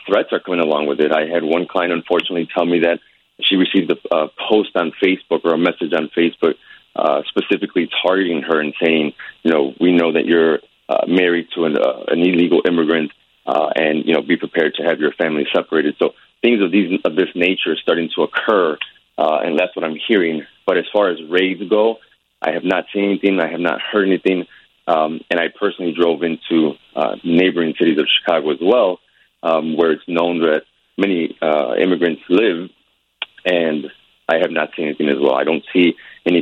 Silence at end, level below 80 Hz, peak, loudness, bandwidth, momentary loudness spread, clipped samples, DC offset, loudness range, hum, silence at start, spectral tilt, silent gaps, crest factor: 0 s; -64 dBFS; -2 dBFS; -17 LUFS; 6 kHz; 6 LU; under 0.1%; under 0.1%; 2 LU; none; 0 s; -7 dB/octave; none; 16 dB